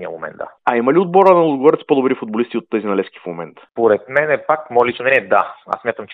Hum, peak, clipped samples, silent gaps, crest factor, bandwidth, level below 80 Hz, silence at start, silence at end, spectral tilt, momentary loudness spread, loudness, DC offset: none; 0 dBFS; under 0.1%; none; 16 dB; 5 kHz; -64 dBFS; 0 s; 0 s; -8 dB/octave; 17 LU; -16 LUFS; under 0.1%